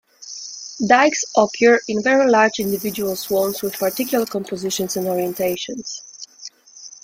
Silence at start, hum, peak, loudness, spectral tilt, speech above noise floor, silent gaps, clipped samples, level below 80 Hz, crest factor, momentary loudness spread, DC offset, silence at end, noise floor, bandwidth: 0.2 s; none; 0 dBFS; -19 LUFS; -3.5 dB/octave; 24 dB; none; under 0.1%; -62 dBFS; 18 dB; 20 LU; under 0.1%; 0.1 s; -42 dBFS; 16.5 kHz